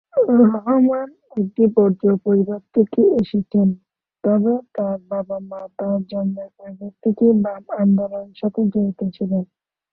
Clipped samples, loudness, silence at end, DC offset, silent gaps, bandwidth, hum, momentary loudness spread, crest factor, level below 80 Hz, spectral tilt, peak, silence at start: under 0.1%; -19 LUFS; 0.5 s; under 0.1%; none; 4.4 kHz; none; 13 LU; 16 dB; -60 dBFS; -12 dB/octave; -2 dBFS; 0.15 s